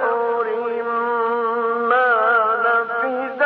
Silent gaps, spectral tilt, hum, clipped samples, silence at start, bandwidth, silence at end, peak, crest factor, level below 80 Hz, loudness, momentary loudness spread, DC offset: none; -0.5 dB/octave; 50 Hz at -60 dBFS; under 0.1%; 0 s; 4.9 kHz; 0 s; -6 dBFS; 14 dB; -82 dBFS; -19 LUFS; 7 LU; under 0.1%